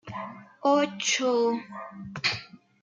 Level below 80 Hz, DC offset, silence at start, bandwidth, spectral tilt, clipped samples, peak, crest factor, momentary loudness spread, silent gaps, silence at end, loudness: -68 dBFS; under 0.1%; 0.05 s; 9.4 kHz; -3 dB/octave; under 0.1%; -10 dBFS; 18 dB; 16 LU; none; 0.25 s; -26 LUFS